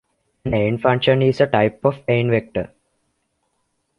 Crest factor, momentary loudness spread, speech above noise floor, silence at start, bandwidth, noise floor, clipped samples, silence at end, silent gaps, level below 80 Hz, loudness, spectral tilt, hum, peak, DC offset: 18 dB; 12 LU; 53 dB; 0.45 s; 7 kHz; -70 dBFS; under 0.1%; 1.35 s; none; -48 dBFS; -19 LUFS; -8 dB/octave; none; -2 dBFS; under 0.1%